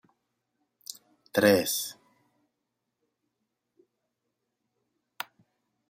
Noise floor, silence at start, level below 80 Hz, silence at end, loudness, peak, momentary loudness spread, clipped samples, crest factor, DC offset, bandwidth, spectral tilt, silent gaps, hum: -83 dBFS; 1.35 s; -76 dBFS; 3.95 s; -26 LUFS; -8 dBFS; 21 LU; under 0.1%; 26 dB; under 0.1%; 15.5 kHz; -3.5 dB/octave; none; 60 Hz at -75 dBFS